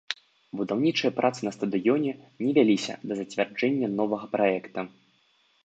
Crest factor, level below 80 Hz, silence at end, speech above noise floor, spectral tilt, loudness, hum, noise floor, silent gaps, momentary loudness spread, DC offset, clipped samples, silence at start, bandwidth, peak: 20 dB; -74 dBFS; 0.75 s; 40 dB; -5.5 dB/octave; -27 LUFS; none; -66 dBFS; none; 13 LU; under 0.1%; under 0.1%; 0.1 s; 8.6 kHz; -8 dBFS